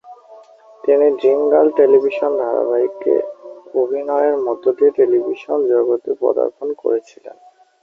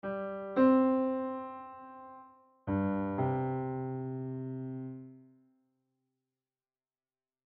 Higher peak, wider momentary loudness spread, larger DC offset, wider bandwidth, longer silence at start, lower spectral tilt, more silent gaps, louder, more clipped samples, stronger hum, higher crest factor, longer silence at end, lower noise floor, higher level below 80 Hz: first, -2 dBFS vs -16 dBFS; second, 8 LU vs 22 LU; neither; first, 6 kHz vs 4.2 kHz; about the same, 0.05 s vs 0.05 s; second, -7 dB/octave vs -11.5 dB/octave; neither; first, -16 LUFS vs -33 LUFS; neither; neither; about the same, 16 dB vs 20 dB; second, 0.55 s vs 2.3 s; second, -44 dBFS vs under -90 dBFS; about the same, -66 dBFS vs -68 dBFS